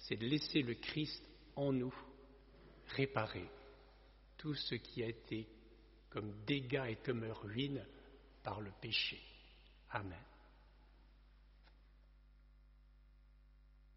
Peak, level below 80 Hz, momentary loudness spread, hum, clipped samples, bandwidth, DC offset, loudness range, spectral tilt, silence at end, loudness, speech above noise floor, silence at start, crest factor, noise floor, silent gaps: -20 dBFS; -64 dBFS; 24 LU; 50 Hz at -65 dBFS; under 0.1%; 5.8 kHz; under 0.1%; 12 LU; -4 dB/octave; 0 s; -42 LUFS; 23 dB; 0 s; 24 dB; -65 dBFS; none